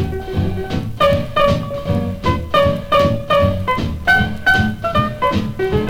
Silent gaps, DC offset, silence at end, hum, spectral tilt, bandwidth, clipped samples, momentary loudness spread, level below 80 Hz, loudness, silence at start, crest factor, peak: none; under 0.1%; 0 s; none; -6.5 dB/octave; 18.5 kHz; under 0.1%; 6 LU; -30 dBFS; -17 LUFS; 0 s; 14 dB; -2 dBFS